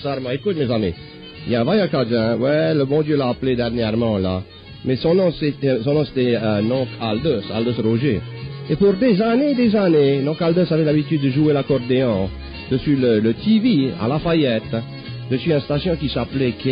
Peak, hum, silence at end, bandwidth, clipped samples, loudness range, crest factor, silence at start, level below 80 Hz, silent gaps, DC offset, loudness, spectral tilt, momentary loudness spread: -6 dBFS; none; 0 s; 5.2 kHz; under 0.1%; 3 LU; 12 dB; 0 s; -42 dBFS; none; under 0.1%; -19 LUFS; -11 dB/octave; 9 LU